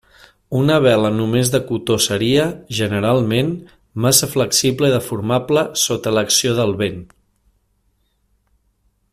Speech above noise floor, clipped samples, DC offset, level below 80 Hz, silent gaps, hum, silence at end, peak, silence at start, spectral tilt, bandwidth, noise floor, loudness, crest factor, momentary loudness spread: 47 dB; under 0.1%; under 0.1%; -50 dBFS; none; none; 2.05 s; 0 dBFS; 0.5 s; -4 dB/octave; 16 kHz; -64 dBFS; -17 LUFS; 18 dB; 8 LU